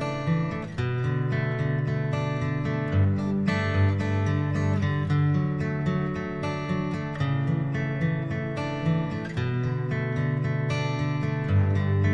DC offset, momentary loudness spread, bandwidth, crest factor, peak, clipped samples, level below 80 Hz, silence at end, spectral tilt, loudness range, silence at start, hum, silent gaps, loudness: under 0.1%; 5 LU; 8 kHz; 14 dB; -12 dBFS; under 0.1%; -50 dBFS; 0 s; -8 dB/octave; 3 LU; 0 s; none; none; -27 LUFS